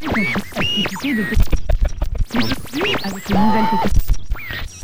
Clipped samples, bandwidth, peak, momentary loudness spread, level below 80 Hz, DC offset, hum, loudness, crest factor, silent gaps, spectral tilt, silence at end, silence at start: under 0.1%; 16 kHz; -2 dBFS; 8 LU; -22 dBFS; 6%; none; -20 LUFS; 14 dB; none; -5 dB/octave; 0 s; 0 s